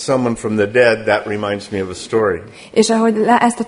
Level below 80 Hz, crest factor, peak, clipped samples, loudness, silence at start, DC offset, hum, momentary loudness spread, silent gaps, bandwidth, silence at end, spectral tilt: -50 dBFS; 16 dB; 0 dBFS; under 0.1%; -16 LUFS; 0 s; under 0.1%; none; 9 LU; none; 11 kHz; 0 s; -4.5 dB/octave